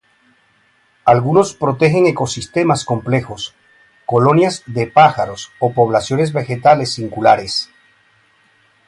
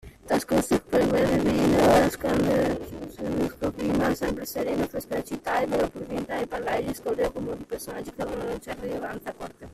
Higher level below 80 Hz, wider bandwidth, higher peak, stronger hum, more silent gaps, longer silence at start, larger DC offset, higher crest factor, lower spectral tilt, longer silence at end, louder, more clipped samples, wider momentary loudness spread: about the same, -50 dBFS vs -46 dBFS; second, 11.5 kHz vs 15.5 kHz; first, 0 dBFS vs -8 dBFS; neither; neither; first, 1.05 s vs 0.05 s; neither; about the same, 16 dB vs 18 dB; about the same, -5.5 dB/octave vs -5.5 dB/octave; first, 1.25 s vs 0 s; first, -15 LUFS vs -26 LUFS; neither; second, 10 LU vs 13 LU